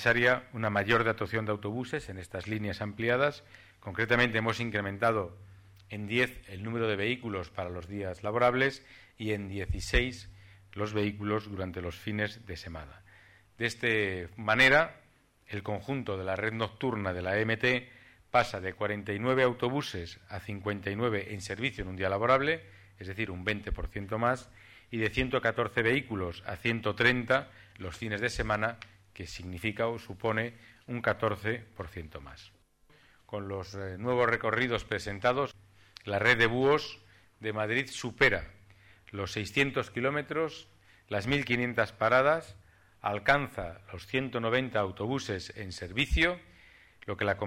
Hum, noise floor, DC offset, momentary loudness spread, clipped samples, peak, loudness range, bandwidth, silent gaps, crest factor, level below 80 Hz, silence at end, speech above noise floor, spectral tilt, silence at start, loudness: none; -63 dBFS; under 0.1%; 16 LU; under 0.1%; -10 dBFS; 5 LU; 16 kHz; none; 22 dB; -48 dBFS; 0 s; 32 dB; -5.5 dB/octave; 0 s; -30 LUFS